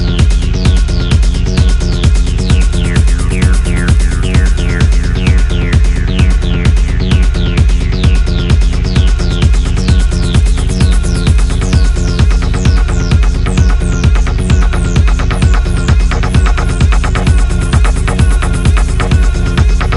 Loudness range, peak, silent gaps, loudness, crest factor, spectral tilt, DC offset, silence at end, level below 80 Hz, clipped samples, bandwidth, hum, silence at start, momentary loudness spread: 0 LU; 0 dBFS; none; -12 LUFS; 8 dB; -6 dB/octave; 0.2%; 0 s; -10 dBFS; under 0.1%; 11.5 kHz; none; 0 s; 1 LU